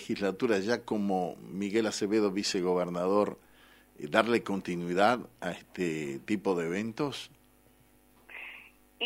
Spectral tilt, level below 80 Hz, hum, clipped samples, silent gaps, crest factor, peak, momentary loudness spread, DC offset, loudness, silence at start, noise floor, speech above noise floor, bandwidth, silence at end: -5 dB/octave; -70 dBFS; none; under 0.1%; none; 24 dB; -6 dBFS; 16 LU; under 0.1%; -31 LUFS; 0 s; -62 dBFS; 32 dB; 16 kHz; 0 s